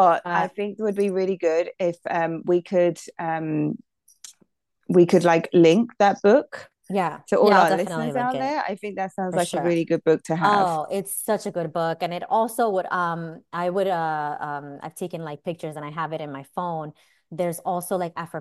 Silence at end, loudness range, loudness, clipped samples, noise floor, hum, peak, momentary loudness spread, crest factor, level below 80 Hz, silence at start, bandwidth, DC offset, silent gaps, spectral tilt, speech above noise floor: 0 s; 10 LU; -23 LUFS; under 0.1%; -66 dBFS; none; -4 dBFS; 15 LU; 20 dB; -72 dBFS; 0 s; 12.5 kHz; under 0.1%; none; -6 dB/octave; 43 dB